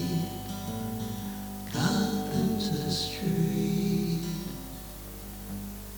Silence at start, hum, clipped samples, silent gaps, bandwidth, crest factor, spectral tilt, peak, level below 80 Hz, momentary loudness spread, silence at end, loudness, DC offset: 0 s; 50 Hz at -40 dBFS; under 0.1%; none; over 20 kHz; 16 dB; -5.5 dB/octave; -14 dBFS; -48 dBFS; 13 LU; 0 s; -31 LUFS; under 0.1%